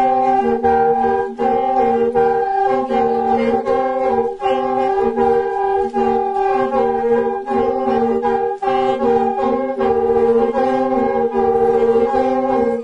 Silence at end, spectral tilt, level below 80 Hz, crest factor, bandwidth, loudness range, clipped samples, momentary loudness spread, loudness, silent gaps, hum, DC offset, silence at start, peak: 0 s; -7 dB/octave; -46 dBFS; 12 dB; 7.8 kHz; 1 LU; under 0.1%; 4 LU; -16 LUFS; none; none; under 0.1%; 0 s; -2 dBFS